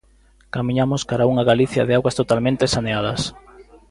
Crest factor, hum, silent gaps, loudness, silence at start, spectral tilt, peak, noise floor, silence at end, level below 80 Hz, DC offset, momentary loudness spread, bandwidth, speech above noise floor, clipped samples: 18 dB; none; none; -19 LUFS; 0.55 s; -5.5 dB/octave; -2 dBFS; -54 dBFS; 0.3 s; -46 dBFS; under 0.1%; 9 LU; 11.5 kHz; 35 dB; under 0.1%